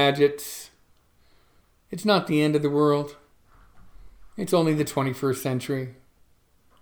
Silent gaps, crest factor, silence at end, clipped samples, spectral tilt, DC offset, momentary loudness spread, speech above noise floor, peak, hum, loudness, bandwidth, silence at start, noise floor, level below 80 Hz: none; 20 dB; 0.9 s; under 0.1%; -5.5 dB/octave; under 0.1%; 17 LU; 37 dB; -6 dBFS; none; -24 LUFS; over 20 kHz; 0 s; -61 dBFS; -60 dBFS